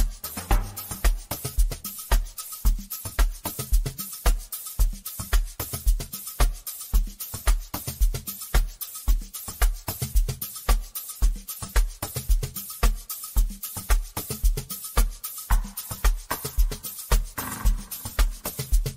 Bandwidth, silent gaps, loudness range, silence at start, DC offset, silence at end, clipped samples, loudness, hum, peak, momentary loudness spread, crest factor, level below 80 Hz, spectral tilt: 16.5 kHz; none; 1 LU; 0 s; under 0.1%; 0 s; under 0.1%; -29 LUFS; none; -6 dBFS; 5 LU; 18 dB; -26 dBFS; -3.5 dB/octave